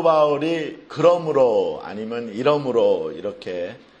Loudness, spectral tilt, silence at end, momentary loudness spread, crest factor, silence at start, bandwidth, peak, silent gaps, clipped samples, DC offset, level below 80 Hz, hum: -21 LUFS; -6.5 dB/octave; 0.25 s; 13 LU; 18 dB; 0 s; 8.4 kHz; -2 dBFS; none; under 0.1%; under 0.1%; -64 dBFS; none